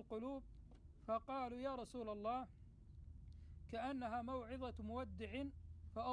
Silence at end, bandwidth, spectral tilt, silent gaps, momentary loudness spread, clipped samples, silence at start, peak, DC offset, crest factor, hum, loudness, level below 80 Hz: 0 s; 10 kHz; -7 dB/octave; none; 16 LU; under 0.1%; 0 s; -32 dBFS; under 0.1%; 16 dB; none; -48 LUFS; -60 dBFS